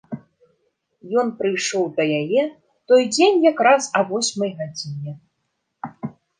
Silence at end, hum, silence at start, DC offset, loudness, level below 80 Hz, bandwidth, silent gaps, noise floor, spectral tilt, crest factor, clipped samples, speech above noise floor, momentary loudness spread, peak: 0.3 s; none; 0.1 s; under 0.1%; -19 LUFS; -72 dBFS; 10 kHz; none; -74 dBFS; -4 dB/octave; 18 dB; under 0.1%; 55 dB; 20 LU; -2 dBFS